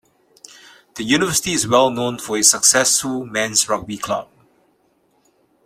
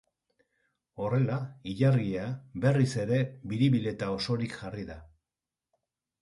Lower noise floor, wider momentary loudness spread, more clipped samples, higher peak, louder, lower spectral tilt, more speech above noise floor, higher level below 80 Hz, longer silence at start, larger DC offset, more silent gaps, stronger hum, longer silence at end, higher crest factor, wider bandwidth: second, -61 dBFS vs under -90 dBFS; about the same, 13 LU vs 13 LU; neither; first, 0 dBFS vs -14 dBFS; first, -16 LUFS vs -30 LUFS; second, -2 dB/octave vs -7.5 dB/octave; second, 43 dB vs over 61 dB; about the same, -54 dBFS vs -58 dBFS; about the same, 0.95 s vs 0.95 s; neither; neither; neither; first, 1.4 s vs 1.15 s; about the same, 20 dB vs 18 dB; first, 16 kHz vs 11.5 kHz